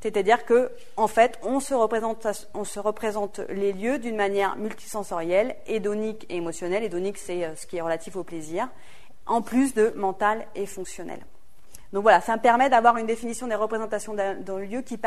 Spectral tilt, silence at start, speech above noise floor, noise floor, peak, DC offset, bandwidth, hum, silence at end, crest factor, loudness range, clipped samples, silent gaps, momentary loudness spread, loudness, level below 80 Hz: -4.5 dB/octave; 0 s; 28 dB; -53 dBFS; -4 dBFS; 1%; 13.5 kHz; none; 0 s; 22 dB; 6 LU; under 0.1%; none; 14 LU; -25 LUFS; -58 dBFS